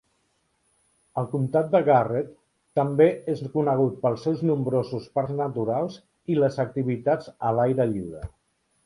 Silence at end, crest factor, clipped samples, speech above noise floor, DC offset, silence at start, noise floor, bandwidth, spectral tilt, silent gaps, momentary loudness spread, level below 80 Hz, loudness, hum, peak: 0.55 s; 20 dB; under 0.1%; 47 dB; under 0.1%; 1.15 s; -70 dBFS; 11 kHz; -9 dB/octave; none; 12 LU; -56 dBFS; -25 LUFS; none; -6 dBFS